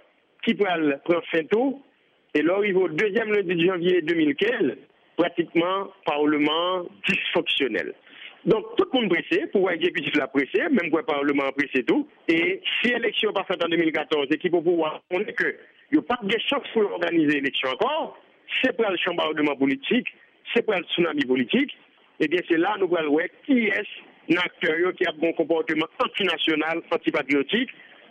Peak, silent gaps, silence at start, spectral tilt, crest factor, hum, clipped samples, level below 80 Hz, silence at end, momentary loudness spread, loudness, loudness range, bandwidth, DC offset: -8 dBFS; none; 0.45 s; -6 dB/octave; 16 dB; none; under 0.1%; -68 dBFS; 0.3 s; 6 LU; -23 LUFS; 1 LU; 8.6 kHz; under 0.1%